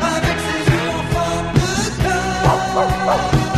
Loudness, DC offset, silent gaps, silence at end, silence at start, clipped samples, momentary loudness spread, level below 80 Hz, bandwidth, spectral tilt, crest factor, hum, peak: -17 LUFS; 0.2%; none; 0 s; 0 s; under 0.1%; 3 LU; -30 dBFS; 13.5 kHz; -5 dB/octave; 16 dB; none; -2 dBFS